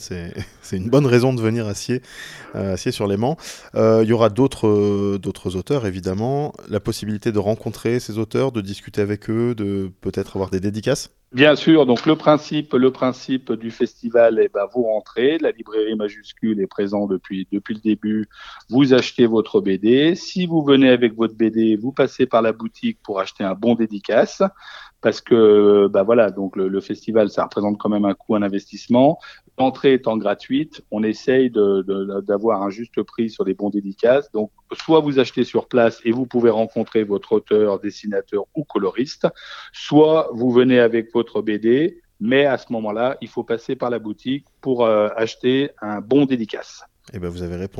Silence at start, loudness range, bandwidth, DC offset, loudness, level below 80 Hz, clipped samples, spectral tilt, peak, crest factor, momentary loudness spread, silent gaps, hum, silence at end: 0 s; 5 LU; 13 kHz; under 0.1%; -19 LUFS; -54 dBFS; under 0.1%; -6.5 dB/octave; 0 dBFS; 18 dB; 12 LU; none; none; 0 s